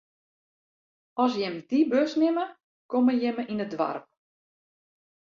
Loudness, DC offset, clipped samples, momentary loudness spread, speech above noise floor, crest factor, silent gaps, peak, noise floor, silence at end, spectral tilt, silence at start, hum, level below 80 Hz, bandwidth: -26 LUFS; under 0.1%; under 0.1%; 8 LU; over 65 dB; 18 dB; 2.64-2.89 s; -10 dBFS; under -90 dBFS; 1.2 s; -6 dB/octave; 1.15 s; none; -74 dBFS; 7.2 kHz